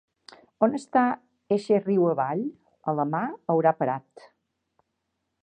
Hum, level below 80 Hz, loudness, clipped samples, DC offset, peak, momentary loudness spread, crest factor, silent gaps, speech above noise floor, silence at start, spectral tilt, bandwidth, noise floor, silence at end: none; -76 dBFS; -26 LUFS; under 0.1%; under 0.1%; -6 dBFS; 10 LU; 20 dB; none; 55 dB; 0.6 s; -8 dB/octave; 9.6 kHz; -79 dBFS; 1.45 s